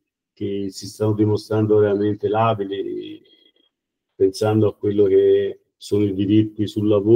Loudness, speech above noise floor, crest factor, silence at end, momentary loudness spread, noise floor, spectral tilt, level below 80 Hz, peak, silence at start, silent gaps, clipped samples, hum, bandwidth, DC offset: -20 LUFS; 61 dB; 16 dB; 0 s; 12 LU; -79 dBFS; -7.5 dB/octave; -62 dBFS; -4 dBFS; 0.4 s; none; under 0.1%; none; 13.5 kHz; under 0.1%